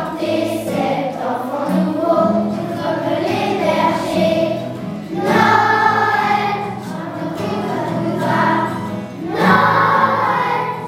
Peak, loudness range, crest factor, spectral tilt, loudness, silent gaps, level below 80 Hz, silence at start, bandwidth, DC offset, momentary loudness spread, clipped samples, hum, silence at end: 0 dBFS; 3 LU; 16 dB; -6 dB/octave; -17 LUFS; none; -56 dBFS; 0 s; 16 kHz; under 0.1%; 12 LU; under 0.1%; none; 0 s